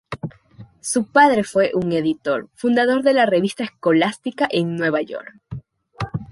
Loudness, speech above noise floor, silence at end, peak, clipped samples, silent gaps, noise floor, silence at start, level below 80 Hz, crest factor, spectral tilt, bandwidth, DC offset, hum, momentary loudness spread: -19 LUFS; 26 dB; 0.05 s; -2 dBFS; under 0.1%; none; -45 dBFS; 0.1 s; -54 dBFS; 18 dB; -5 dB/octave; 11.5 kHz; under 0.1%; none; 18 LU